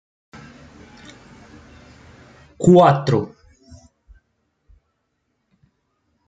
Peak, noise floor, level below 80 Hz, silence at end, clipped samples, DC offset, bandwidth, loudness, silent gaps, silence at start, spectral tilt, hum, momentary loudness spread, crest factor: -2 dBFS; -72 dBFS; -54 dBFS; 3 s; under 0.1%; under 0.1%; 9.4 kHz; -15 LUFS; none; 2.6 s; -7.5 dB/octave; none; 23 LU; 22 dB